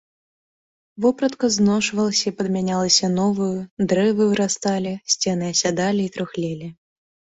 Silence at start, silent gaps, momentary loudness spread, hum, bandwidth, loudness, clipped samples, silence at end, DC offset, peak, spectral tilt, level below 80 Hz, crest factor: 0.95 s; 3.71-3.77 s; 9 LU; none; 8.2 kHz; -20 LUFS; under 0.1%; 0.65 s; under 0.1%; -2 dBFS; -4 dB/octave; -58 dBFS; 18 dB